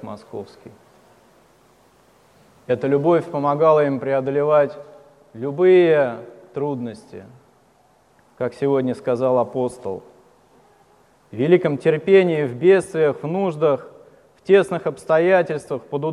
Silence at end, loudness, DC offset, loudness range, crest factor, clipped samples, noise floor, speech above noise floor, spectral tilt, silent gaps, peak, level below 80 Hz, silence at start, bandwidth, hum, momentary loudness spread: 0 s; -19 LUFS; under 0.1%; 6 LU; 18 dB; under 0.1%; -57 dBFS; 38 dB; -7.5 dB/octave; none; -2 dBFS; -66 dBFS; 0.05 s; 11 kHz; none; 19 LU